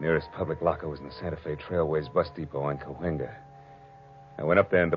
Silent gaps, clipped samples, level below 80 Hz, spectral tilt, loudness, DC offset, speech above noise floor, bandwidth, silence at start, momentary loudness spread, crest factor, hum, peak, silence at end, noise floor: none; under 0.1%; -52 dBFS; -6 dB/octave; -29 LUFS; under 0.1%; 23 dB; 5.6 kHz; 0 s; 13 LU; 22 dB; none; -6 dBFS; 0 s; -50 dBFS